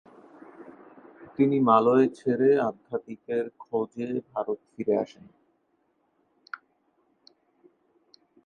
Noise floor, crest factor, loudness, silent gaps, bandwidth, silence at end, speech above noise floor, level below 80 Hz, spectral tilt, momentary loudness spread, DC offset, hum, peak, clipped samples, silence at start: -71 dBFS; 22 dB; -26 LUFS; none; 8.8 kHz; 3.4 s; 46 dB; -74 dBFS; -8.5 dB/octave; 23 LU; under 0.1%; none; -6 dBFS; under 0.1%; 0.6 s